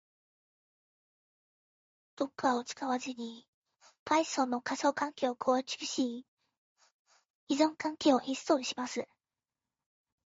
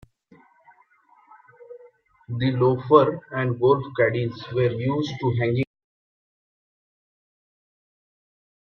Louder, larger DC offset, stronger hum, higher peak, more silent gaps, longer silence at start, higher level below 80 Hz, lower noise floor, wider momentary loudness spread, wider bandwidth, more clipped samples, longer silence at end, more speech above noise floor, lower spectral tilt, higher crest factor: second, -33 LUFS vs -22 LUFS; neither; neither; second, -14 dBFS vs -2 dBFS; first, 3.48-3.62 s, 3.99-4.06 s, 6.28-6.37 s, 6.57-6.76 s, 6.92-7.05 s, 7.25-7.47 s vs none; first, 2.2 s vs 1.7 s; second, -80 dBFS vs -60 dBFS; first, under -90 dBFS vs -58 dBFS; about the same, 11 LU vs 10 LU; first, 8 kHz vs 6.6 kHz; neither; second, 1.25 s vs 3.1 s; first, over 58 dB vs 37 dB; second, -1.5 dB/octave vs -8.5 dB/octave; about the same, 20 dB vs 24 dB